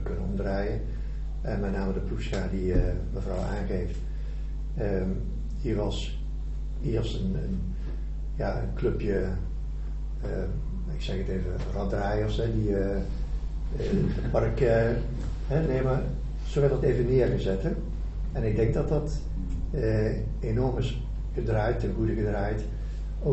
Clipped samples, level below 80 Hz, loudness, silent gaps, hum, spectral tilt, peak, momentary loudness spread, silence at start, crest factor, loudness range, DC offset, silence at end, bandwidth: under 0.1%; -32 dBFS; -30 LUFS; none; none; -8 dB/octave; -10 dBFS; 10 LU; 0 s; 18 dB; 5 LU; under 0.1%; 0 s; 8.2 kHz